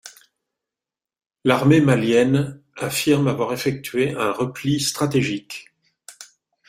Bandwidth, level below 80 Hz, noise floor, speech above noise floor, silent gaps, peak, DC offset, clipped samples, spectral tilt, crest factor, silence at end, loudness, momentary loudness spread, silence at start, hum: 16 kHz; -56 dBFS; -89 dBFS; 69 dB; none; -2 dBFS; under 0.1%; under 0.1%; -5.5 dB/octave; 20 dB; 0.45 s; -20 LUFS; 14 LU; 0.05 s; none